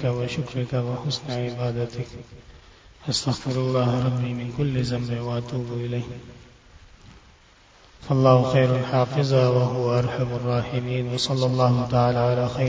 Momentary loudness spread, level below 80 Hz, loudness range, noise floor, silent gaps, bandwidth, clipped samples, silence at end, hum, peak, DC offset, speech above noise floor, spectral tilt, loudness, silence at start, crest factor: 10 LU; -50 dBFS; 8 LU; -53 dBFS; none; 8 kHz; under 0.1%; 0 s; none; -4 dBFS; under 0.1%; 31 dB; -6.5 dB/octave; -23 LUFS; 0 s; 20 dB